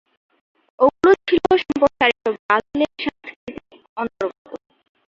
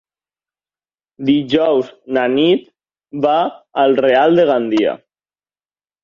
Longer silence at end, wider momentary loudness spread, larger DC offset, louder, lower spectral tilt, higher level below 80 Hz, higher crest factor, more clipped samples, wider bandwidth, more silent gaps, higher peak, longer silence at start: second, 0.55 s vs 1.05 s; first, 21 LU vs 9 LU; neither; second, -19 LUFS vs -15 LUFS; second, -5.5 dB/octave vs -7 dB/octave; first, -54 dBFS vs -60 dBFS; first, 20 dB vs 14 dB; neither; about the same, 7.4 kHz vs 7.2 kHz; first, 2.39-2.49 s, 3.36-3.47 s, 3.89-3.96 s, 4.38-4.45 s vs none; about the same, -2 dBFS vs -2 dBFS; second, 0.8 s vs 1.2 s